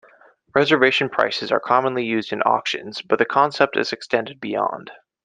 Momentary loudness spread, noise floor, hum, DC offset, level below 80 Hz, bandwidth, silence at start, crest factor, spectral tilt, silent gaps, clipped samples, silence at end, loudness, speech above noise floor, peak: 8 LU; -53 dBFS; none; under 0.1%; -66 dBFS; 9.4 kHz; 0.55 s; 20 dB; -4.5 dB/octave; none; under 0.1%; 0.3 s; -20 LUFS; 33 dB; -2 dBFS